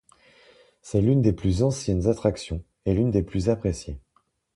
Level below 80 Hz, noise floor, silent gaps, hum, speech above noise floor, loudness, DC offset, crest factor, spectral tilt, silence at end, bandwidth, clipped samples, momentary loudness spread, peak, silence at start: -40 dBFS; -68 dBFS; none; none; 45 dB; -24 LUFS; under 0.1%; 18 dB; -7.5 dB/octave; 0.55 s; 11.5 kHz; under 0.1%; 13 LU; -8 dBFS; 0.85 s